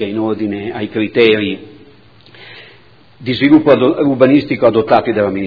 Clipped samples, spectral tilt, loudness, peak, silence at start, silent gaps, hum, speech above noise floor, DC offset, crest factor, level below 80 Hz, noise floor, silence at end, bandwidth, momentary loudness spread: 0.3%; -9 dB/octave; -13 LUFS; 0 dBFS; 0 s; none; none; 33 dB; 0.3%; 14 dB; -52 dBFS; -45 dBFS; 0 s; 5.4 kHz; 11 LU